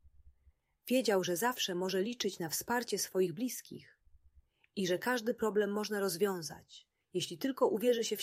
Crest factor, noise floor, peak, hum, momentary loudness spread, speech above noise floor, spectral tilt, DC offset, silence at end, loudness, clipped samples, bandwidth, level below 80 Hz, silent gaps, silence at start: 18 dB; -70 dBFS; -18 dBFS; none; 12 LU; 36 dB; -3.5 dB/octave; under 0.1%; 0 s; -34 LUFS; under 0.1%; 16 kHz; -72 dBFS; none; 0.05 s